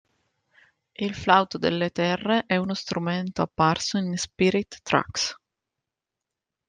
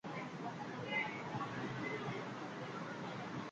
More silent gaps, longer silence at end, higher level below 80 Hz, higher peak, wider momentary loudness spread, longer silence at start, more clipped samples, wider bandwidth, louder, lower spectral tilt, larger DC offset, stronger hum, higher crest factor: neither; first, 1.35 s vs 0 s; first, -58 dBFS vs -76 dBFS; first, -4 dBFS vs -26 dBFS; about the same, 8 LU vs 6 LU; first, 1 s vs 0.05 s; neither; about the same, 9.8 kHz vs 9 kHz; first, -25 LUFS vs -43 LUFS; about the same, -4.5 dB/octave vs -5.5 dB/octave; neither; neither; first, 22 dB vs 16 dB